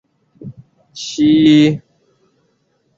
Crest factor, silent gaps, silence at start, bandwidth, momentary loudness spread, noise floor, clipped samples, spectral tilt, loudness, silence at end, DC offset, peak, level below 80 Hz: 14 dB; none; 0.45 s; 7.6 kHz; 27 LU; -62 dBFS; under 0.1%; -6 dB/octave; -12 LUFS; 1.2 s; under 0.1%; -2 dBFS; -54 dBFS